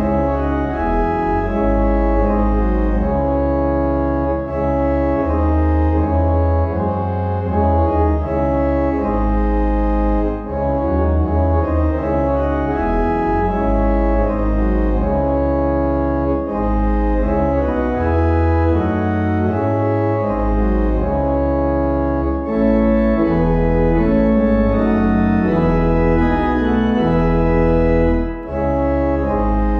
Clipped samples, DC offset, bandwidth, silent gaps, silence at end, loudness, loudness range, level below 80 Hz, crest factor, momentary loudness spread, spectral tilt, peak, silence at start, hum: under 0.1%; under 0.1%; 5.2 kHz; none; 0 s; -17 LUFS; 2 LU; -22 dBFS; 12 dB; 4 LU; -10.5 dB/octave; -4 dBFS; 0 s; none